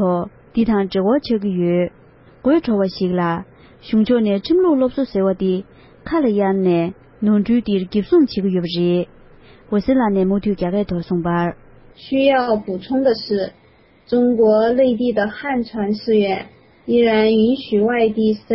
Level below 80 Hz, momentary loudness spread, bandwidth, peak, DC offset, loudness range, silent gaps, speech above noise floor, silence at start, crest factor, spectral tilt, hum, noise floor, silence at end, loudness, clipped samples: -48 dBFS; 8 LU; 5.8 kHz; -4 dBFS; under 0.1%; 2 LU; none; 35 dB; 0 s; 14 dB; -11.5 dB/octave; none; -51 dBFS; 0 s; -18 LUFS; under 0.1%